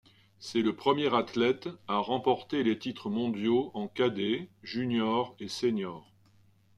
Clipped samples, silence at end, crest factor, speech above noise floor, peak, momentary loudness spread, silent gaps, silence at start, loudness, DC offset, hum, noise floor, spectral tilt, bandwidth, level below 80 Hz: under 0.1%; 0.75 s; 20 dB; 33 dB; -12 dBFS; 8 LU; none; 0.4 s; -30 LUFS; under 0.1%; none; -63 dBFS; -6 dB/octave; 12 kHz; -72 dBFS